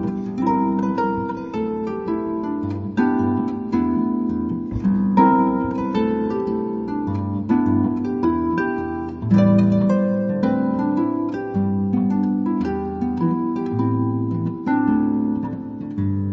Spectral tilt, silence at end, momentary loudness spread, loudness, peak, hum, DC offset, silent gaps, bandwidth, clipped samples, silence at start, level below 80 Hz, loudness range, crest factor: -10 dB/octave; 0 s; 8 LU; -21 LUFS; -2 dBFS; none; under 0.1%; none; 6.2 kHz; under 0.1%; 0 s; -46 dBFS; 3 LU; 18 dB